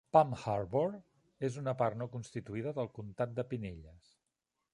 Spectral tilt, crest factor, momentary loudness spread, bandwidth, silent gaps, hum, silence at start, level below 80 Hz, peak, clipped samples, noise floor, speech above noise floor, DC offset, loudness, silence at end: -7.5 dB/octave; 24 dB; 10 LU; 11 kHz; none; none; 0.15 s; -64 dBFS; -12 dBFS; under 0.1%; -87 dBFS; 52 dB; under 0.1%; -36 LUFS; 0.75 s